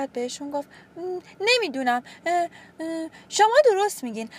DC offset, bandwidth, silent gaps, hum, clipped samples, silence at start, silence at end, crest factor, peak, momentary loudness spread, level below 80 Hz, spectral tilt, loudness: under 0.1%; 15.5 kHz; none; none; under 0.1%; 0 s; 0 s; 20 dB; -6 dBFS; 15 LU; -72 dBFS; -2 dB/octave; -24 LUFS